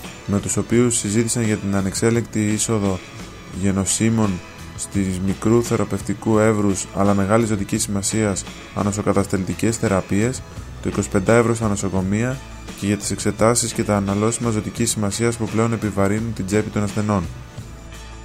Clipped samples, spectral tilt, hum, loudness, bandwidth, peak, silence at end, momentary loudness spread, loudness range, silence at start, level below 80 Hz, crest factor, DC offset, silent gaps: under 0.1%; -5 dB/octave; none; -20 LUFS; 16 kHz; -2 dBFS; 0 s; 12 LU; 2 LU; 0 s; -42 dBFS; 18 dB; under 0.1%; none